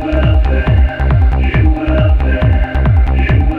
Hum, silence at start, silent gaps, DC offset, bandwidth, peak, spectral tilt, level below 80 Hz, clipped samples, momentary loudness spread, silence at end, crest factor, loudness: none; 0 s; none; under 0.1%; 4.3 kHz; 0 dBFS; -9.5 dB/octave; -12 dBFS; under 0.1%; 1 LU; 0 s; 10 dB; -12 LUFS